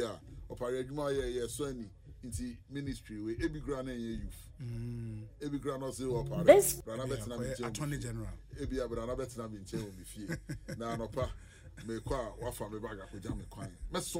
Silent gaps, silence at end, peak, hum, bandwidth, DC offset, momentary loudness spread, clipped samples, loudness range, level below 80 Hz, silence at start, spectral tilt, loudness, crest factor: none; 0 s; -8 dBFS; none; 16 kHz; under 0.1%; 11 LU; under 0.1%; 10 LU; -50 dBFS; 0 s; -5 dB/octave; -36 LUFS; 28 dB